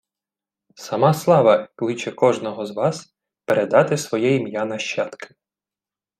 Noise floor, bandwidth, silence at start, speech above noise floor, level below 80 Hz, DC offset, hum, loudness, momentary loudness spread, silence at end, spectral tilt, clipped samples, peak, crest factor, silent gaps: under -90 dBFS; 15 kHz; 0.8 s; over 71 dB; -68 dBFS; under 0.1%; none; -20 LUFS; 13 LU; 0.95 s; -5.5 dB/octave; under 0.1%; -2 dBFS; 18 dB; none